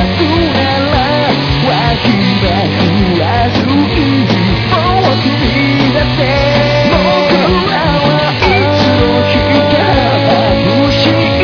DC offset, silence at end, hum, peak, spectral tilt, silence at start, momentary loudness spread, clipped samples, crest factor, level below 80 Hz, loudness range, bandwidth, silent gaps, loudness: under 0.1%; 0 s; none; 0 dBFS; -7 dB/octave; 0 s; 2 LU; under 0.1%; 10 dB; -24 dBFS; 1 LU; 5.4 kHz; none; -10 LUFS